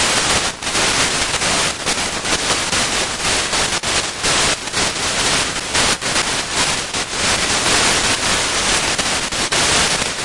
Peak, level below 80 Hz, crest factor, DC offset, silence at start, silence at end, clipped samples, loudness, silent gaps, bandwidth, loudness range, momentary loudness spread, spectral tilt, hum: -2 dBFS; -38 dBFS; 16 dB; under 0.1%; 0 s; 0 s; under 0.1%; -15 LUFS; none; 11.5 kHz; 1 LU; 4 LU; -1 dB/octave; none